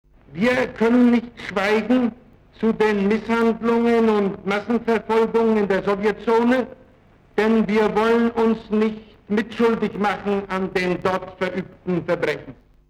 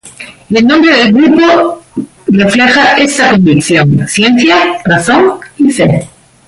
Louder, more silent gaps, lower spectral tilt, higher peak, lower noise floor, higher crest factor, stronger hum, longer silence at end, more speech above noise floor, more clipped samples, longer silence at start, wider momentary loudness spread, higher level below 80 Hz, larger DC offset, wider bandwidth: second, -20 LUFS vs -7 LUFS; neither; first, -7 dB/octave vs -5 dB/octave; second, -6 dBFS vs 0 dBFS; first, -52 dBFS vs -30 dBFS; first, 14 dB vs 8 dB; neither; about the same, 0.35 s vs 0.4 s; first, 33 dB vs 24 dB; neither; first, 0.3 s vs 0.05 s; about the same, 8 LU vs 8 LU; second, -52 dBFS vs -42 dBFS; neither; about the same, 11 kHz vs 11.5 kHz